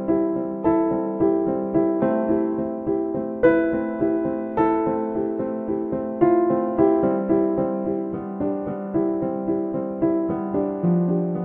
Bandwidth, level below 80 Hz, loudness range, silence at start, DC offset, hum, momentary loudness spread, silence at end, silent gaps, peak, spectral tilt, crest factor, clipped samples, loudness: 3.7 kHz; -52 dBFS; 2 LU; 0 s; under 0.1%; none; 7 LU; 0 s; none; -4 dBFS; -12 dB/octave; 16 dB; under 0.1%; -22 LUFS